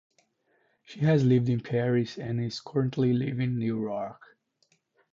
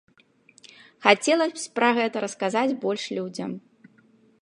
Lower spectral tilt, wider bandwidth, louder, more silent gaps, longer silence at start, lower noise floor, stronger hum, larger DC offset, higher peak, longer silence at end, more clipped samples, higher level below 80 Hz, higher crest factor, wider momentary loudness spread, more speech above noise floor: first, -8 dB/octave vs -3.5 dB/octave; second, 7.4 kHz vs 11.5 kHz; second, -27 LUFS vs -24 LUFS; neither; about the same, 0.9 s vs 1 s; first, -71 dBFS vs -60 dBFS; neither; neither; second, -12 dBFS vs -2 dBFS; first, 1 s vs 0.85 s; neither; first, -62 dBFS vs -80 dBFS; second, 16 dB vs 24 dB; second, 9 LU vs 13 LU; first, 44 dB vs 36 dB